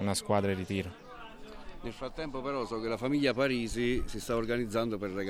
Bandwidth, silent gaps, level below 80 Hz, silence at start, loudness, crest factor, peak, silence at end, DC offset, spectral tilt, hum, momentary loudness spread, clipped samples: 17 kHz; none; -48 dBFS; 0 s; -33 LUFS; 18 dB; -14 dBFS; 0 s; under 0.1%; -5 dB/octave; none; 19 LU; under 0.1%